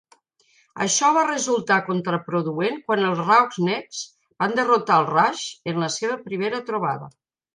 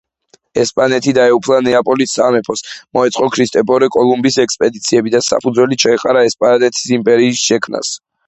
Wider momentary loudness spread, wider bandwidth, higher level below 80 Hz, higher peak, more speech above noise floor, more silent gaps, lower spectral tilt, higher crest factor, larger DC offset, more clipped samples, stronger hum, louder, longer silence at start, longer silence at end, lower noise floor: first, 10 LU vs 6 LU; first, 10.5 kHz vs 8.4 kHz; second, -72 dBFS vs -54 dBFS; second, -4 dBFS vs 0 dBFS; about the same, 40 dB vs 41 dB; neither; about the same, -3.5 dB/octave vs -3.5 dB/octave; first, 20 dB vs 12 dB; neither; neither; neither; second, -21 LUFS vs -13 LUFS; first, 0.75 s vs 0.55 s; first, 0.45 s vs 0.3 s; first, -62 dBFS vs -53 dBFS